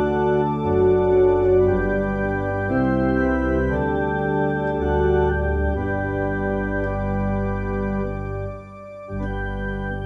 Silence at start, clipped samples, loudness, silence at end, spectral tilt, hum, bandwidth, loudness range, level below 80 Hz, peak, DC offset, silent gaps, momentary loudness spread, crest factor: 0 s; under 0.1%; -21 LUFS; 0 s; -9.5 dB/octave; none; 6.2 kHz; 6 LU; -32 dBFS; -8 dBFS; under 0.1%; none; 11 LU; 12 dB